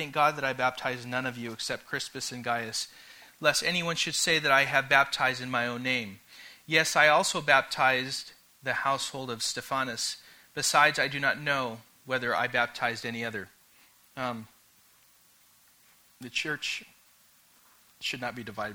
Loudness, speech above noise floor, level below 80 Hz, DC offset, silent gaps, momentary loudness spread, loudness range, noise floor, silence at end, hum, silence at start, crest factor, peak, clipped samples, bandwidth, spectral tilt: -28 LUFS; 33 dB; -68 dBFS; under 0.1%; none; 15 LU; 12 LU; -62 dBFS; 0 s; none; 0 s; 24 dB; -6 dBFS; under 0.1%; over 20 kHz; -2 dB/octave